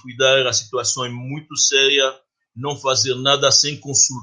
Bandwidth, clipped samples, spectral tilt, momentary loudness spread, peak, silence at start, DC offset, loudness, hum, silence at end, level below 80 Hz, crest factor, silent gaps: 11 kHz; under 0.1%; -1.5 dB/octave; 13 LU; 0 dBFS; 0.05 s; under 0.1%; -16 LUFS; none; 0 s; -64 dBFS; 18 dB; none